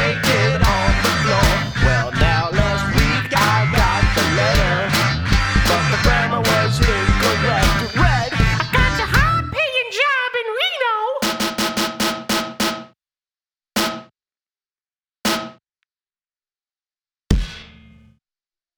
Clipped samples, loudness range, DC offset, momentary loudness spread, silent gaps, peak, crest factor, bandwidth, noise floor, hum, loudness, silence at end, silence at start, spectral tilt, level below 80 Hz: under 0.1%; 11 LU; under 0.1%; 6 LU; none; 0 dBFS; 18 dB; over 20 kHz; under -90 dBFS; none; -17 LUFS; 1.1 s; 0 s; -4.5 dB/octave; -26 dBFS